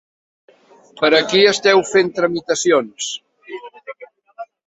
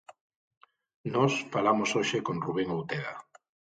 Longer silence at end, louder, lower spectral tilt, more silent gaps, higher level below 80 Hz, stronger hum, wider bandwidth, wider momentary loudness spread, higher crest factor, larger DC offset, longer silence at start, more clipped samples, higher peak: second, 0.25 s vs 0.55 s; first, -15 LUFS vs -29 LUFS; second, -3 dB/octave vs -5 dB/octave; second, none vs 0.21-0.30 s, 0.36-0.51 s, 0.57-0.61 s, 0.94-1.04 s; first, -62 dBFS vs -68 dBFS; neither; second, 8.2 kHz vs 9.2 kHz; first, 23 LU vs 12 LU; about the same, 18 dB vs 20 dB; neither; first, 1 s vs 0.1 s; neither; first, 0 dBFS vs -12 dBFS